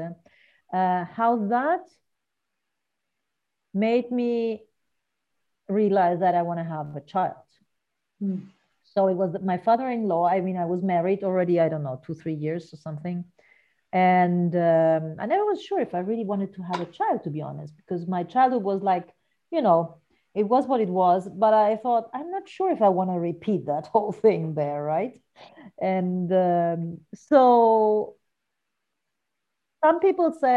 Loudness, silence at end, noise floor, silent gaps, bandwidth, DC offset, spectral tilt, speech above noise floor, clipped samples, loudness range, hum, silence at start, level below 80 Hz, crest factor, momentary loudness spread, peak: -24 LUFS; 0 s; -83 dBFS; none; 8 kHz; under 0.1%; -9 dB/octave; 60 dB; under 0.1%; 5 LU; none; 0 s; -72 dBFS; 18 dB; 13 LU; -6 dBFS